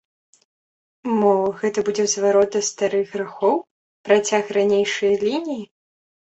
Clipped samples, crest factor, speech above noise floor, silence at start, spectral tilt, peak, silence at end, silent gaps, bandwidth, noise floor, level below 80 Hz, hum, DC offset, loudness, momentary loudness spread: under 0.1%; 18 dB; over 71 dB; 1.05 s; -3.5 dB/octave; -4 dBFS; 0.75 s; 3.71-4.04 s; 8.2 kHz; under -90 dBFS; -66 dBFS; none; under 0.1%; -20 LUFS; 9 LU